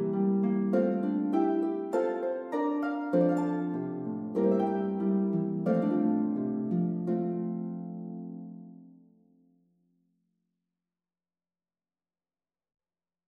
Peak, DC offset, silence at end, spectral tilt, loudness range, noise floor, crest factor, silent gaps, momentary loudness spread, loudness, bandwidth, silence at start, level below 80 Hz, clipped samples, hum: -14 dBFS; under 0.1%; 4.4 s; -10 dB/octave; 13 LU; under -90 dBFS; 16 dB; none; 11 LU; -30 LUFS; 7.6 kHz; 0 s; -84 dBFS; under 0.1%; none